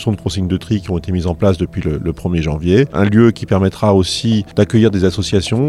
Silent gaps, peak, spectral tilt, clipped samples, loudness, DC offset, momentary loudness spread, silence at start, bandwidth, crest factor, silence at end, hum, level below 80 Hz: none; 0 dBFS; -6.5 dB/octave; under 0.1%; -15 LUFS; under 0.1%; 7 LU; 0 s; 12 kHz; 14 dB; 0 s; none; -34 dBFS